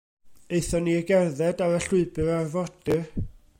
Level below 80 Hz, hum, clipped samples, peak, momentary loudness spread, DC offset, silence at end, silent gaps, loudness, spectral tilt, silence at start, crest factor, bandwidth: -44 dBFS; none; under 0.1%; -10 dBFS; 8 LU; under 0.1%; 0.2 s; none; -25 LUFS; -6 dB/octave; 0.25 s; 16 dB; 16.5 kHz